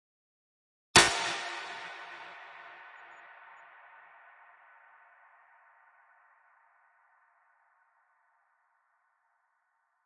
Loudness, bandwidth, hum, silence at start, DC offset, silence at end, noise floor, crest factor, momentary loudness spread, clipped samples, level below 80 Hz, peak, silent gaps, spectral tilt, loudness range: -27 LUFS; 11.5 kHz; none; 0.95 s; under 0.1%; 6.95 s; -77 dBFS; 32 dB; 30 LU; under 0.1%; -64 dBFS; -6 dBFS; none; -1 dB/octave; 26 LU